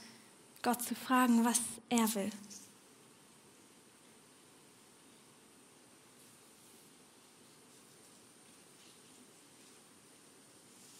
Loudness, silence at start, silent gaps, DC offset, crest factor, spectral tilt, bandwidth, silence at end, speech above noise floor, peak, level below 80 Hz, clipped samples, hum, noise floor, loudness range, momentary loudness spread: -33 LUFS; 0 s; none; under 0.1%; 28 dB; -3 dB/octave; 16 kHz; 8.35 s; 29 dB; -14 dBFS; -86 dBFS; under 0.1%; none; -62 dBFS; 25 LU; 28 LU